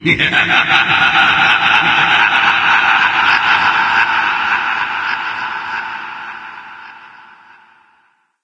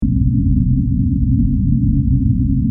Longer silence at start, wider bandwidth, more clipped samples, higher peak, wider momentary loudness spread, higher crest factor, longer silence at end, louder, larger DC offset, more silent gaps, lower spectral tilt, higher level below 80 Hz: about the same, 0 s vs 0 s; first, 10 kHz vs 0.5 kHz; neither; about the same, 0 dBFS vs -2 dBFS; first, 16 LU vs 1 LU; about the same, 14 dB vs 12 dB; first, 1.35 s vs 0 s; first, -11 LUFS vs -16 LUFS; neither; neither; second, -3 dB/octave vs -15 dB/octave; second, -52 dBFS vs -20 dBFS